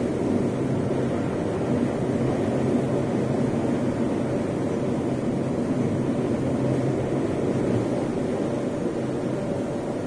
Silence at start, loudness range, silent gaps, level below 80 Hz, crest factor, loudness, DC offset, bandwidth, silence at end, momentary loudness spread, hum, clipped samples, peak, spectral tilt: 0 s; 1 LU; none; -48 dBFS; 14 dB; -25 LUFS; under 0.1%; 10.5 kHz; 0 s; 3 LU; none; under 0.1%; -10 dBFS; -8 dB/octave